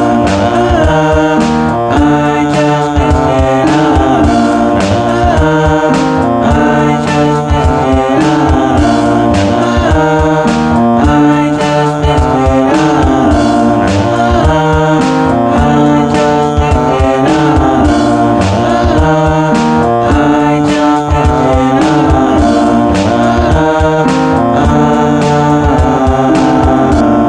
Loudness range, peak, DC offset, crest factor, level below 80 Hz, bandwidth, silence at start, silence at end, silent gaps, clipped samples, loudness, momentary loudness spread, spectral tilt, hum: 1 LU; 0 dBFS; under 0.1%; 8 dB; -20 dBFS; 10.5 kHz; 0 s; 0 s; none; under 0.1%; -9 LUFS; 2 LU; -6.5 dB/octave; none